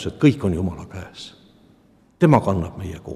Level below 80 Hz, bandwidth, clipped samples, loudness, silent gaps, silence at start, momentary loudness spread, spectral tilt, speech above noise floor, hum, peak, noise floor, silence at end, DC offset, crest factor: -48 dBFS; 12 kHz; under 0.1%; -20 LUFS; none; 0 s; 21 LU; -8 dB/octave; 35 dB; none; -2 dBFS; -55 dBFS; 0 s; under 0.1%; 20 dB